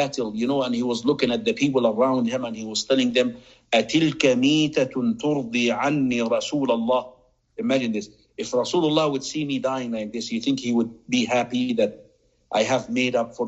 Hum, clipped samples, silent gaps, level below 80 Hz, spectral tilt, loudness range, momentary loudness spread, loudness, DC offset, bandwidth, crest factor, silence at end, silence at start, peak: none; under 0.1%; none; -60 dBFS; -4.5 dB/octave; 3 LU; 8 LU; -23 LUFS; under 0.1%; 8.2 kHz; 18 dB; 0 s; 0 s; -4 dBFS